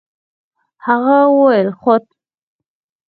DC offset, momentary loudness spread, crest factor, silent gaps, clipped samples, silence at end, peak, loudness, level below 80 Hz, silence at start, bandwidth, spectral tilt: under 0.1%; 7 LU; 16 dB; none; under 0.1%; 1.05 s; 0 dBFS; -13 LUFS; -68 dBFS; 0.85 s; 4.8 kHz; -10 dB/octave